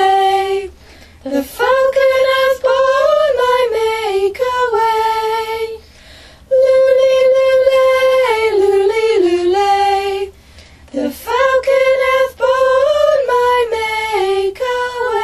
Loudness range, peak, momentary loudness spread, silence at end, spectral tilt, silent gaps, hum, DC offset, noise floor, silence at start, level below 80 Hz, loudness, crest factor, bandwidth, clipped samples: 3 LU; -2 dBFS; 10 LU; 0 s; -3.5 dB/octave; none; none; under 0.1%; -41 dBFS; 0 s; -46 dBFS; -13 LUFS; 12 dB; 14 kHz; under 0.1%